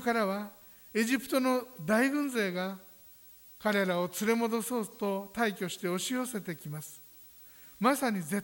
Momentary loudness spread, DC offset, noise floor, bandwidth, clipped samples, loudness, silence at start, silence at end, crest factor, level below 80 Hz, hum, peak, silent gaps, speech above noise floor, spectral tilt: 22 LU; under 0.1%; -55 dBFS; over 20 kHz; under 0.1%; -31 LUFS; 0 s; 0 s; 18 dB; -72 dBFS; none; -14 dBFS; none; 24 dB; -4.5 dB/octave